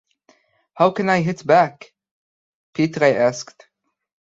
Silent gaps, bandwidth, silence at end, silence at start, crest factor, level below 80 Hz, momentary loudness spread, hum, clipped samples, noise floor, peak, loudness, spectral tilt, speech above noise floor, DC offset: 2.11-2.73 s; 7.8 kHz; 0.8 s; 0.75 s; 20 dB; -64 dBFS; 15 LU; none; under 0.1%; -72 dBFS; -2 dBFS; -18 LUFS; -6 dB/octave; 54 dB; under 0.1%